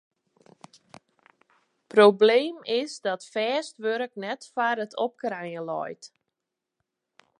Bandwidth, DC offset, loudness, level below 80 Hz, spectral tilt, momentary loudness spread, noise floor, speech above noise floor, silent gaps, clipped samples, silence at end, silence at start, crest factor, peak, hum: 11 kHz; under 0.1%; -25 LUFS; -84 dBFS; -4.5 dB/octave; 15 LU; -86 dBFS; 61 dB; none; under 0.1%; 1.35 s; 1.95 s; 22 dB; -4 dBFS; none